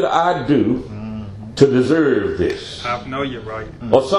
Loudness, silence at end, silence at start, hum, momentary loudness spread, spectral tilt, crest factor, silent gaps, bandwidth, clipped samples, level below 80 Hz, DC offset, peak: -18 LUFS; 0 s; 0 s; none; 15 LU; -6.5 dB/octave; 18 dB; none; 11 kHz; under 0.1%; -44 dBFS; under 0.1%; 0 dBFS